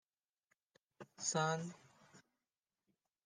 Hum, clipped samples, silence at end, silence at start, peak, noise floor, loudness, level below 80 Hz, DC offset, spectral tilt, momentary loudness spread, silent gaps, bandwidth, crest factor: none; under 0.1%; 1.05 s; 1 s; -24 dBFS; under -90 dBFS; -40 LUFS; under -90 dBFS; under 0.1%; -3.5 dB/octave; 24 LU; none; 10 kHz; 22 dB